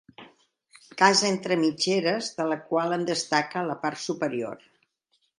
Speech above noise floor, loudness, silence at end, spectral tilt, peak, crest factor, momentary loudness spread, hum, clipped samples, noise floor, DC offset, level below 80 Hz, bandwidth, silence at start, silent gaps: 47 dB; -25 LUFS; 0.85 s; -3.5 dB/octave; -2 dBFS; 26 dB; 11 LU; none; under 0.1%; -73 dBFS; under 0.1%; -76 dBFS; 11.5 kHz; 0.2 s; none